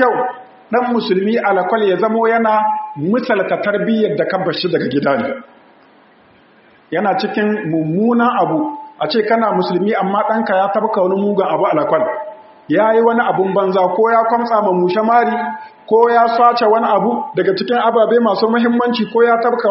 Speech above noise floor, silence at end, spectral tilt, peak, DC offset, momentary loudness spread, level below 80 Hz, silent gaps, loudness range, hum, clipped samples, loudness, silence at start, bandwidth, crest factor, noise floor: 34 dB; 0 s; -4 dB/octave; 0 dBFS; under 0.1%; 7 LU; -66 dBFS; none; 5 LU; none; under 0.1%; -15 LUFS; 0 s; 5.8 kHz; 14 dB; -48 dBFS